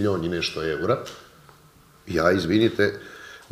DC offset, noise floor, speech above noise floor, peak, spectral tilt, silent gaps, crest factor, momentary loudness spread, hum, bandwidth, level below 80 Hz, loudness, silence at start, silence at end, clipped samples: under 0.1%; -53 dBFS; 30 dB; -6 dBFS; -6 dB/octave; none; 20 dB; 20 LU; none; 15.5 kHz; -52 dBFS; -23 LUFS; 0 s; 0.15 s; under 0.1%